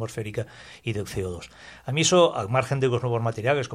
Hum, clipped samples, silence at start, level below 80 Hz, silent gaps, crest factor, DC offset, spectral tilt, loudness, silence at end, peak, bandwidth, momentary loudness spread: none; under 0.1%; 0 s; -54 dBFS; none; 20 dB; under 0.1%; -4.5 dB/octave; -25 LUFS; 0 s; -6 dBFS; 15 kHz; 18 LU